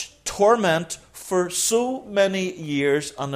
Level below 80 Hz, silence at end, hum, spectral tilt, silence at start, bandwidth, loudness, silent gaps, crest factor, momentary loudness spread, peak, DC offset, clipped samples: -56 dBFS; 0 s; none; -3.5 dB/octave; 0 s; 16 kHz; -22 LUFS; none; 16 dB; 9 LU; -6 dBFS; under 0.1%; under 0.1%